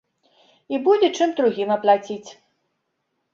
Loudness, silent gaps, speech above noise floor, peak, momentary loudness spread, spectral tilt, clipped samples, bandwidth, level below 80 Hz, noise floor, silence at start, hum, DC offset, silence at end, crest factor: -20 LUFS; none; 55 dB; -4 dBFS; 13 LU; -4.5 dB/octave; under 0.1%; 7.6 kHz; -72 dBFS; -75 dBFS; 0.7 s; none; under 0.1%; 1 s; 20 dB